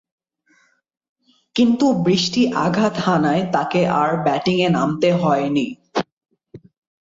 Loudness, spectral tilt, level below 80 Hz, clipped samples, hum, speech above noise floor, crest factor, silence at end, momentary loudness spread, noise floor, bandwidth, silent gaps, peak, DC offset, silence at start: -18 LUFS; -6 dB/octave; -58 dBFS; under 0.1%; none; 43 dB; 16 dB; 0.45 s; 8 LU; -60 dBFS; 7.8 kHz; 6.12-6.21 s; -4 dBFS; under 0.1%; 1.55 s